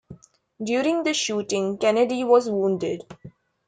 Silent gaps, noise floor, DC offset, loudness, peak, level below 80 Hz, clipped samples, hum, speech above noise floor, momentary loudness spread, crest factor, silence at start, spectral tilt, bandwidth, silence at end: none; -47 dBFS; under 0.1%; -22 LUFS; -6 dBFS; -66 dBFS; under 0.1%; none; 25 dB; 12 LU; 18 dB; 0.1 s; -4 dB/octave; 9.4 kHz; 0.4 s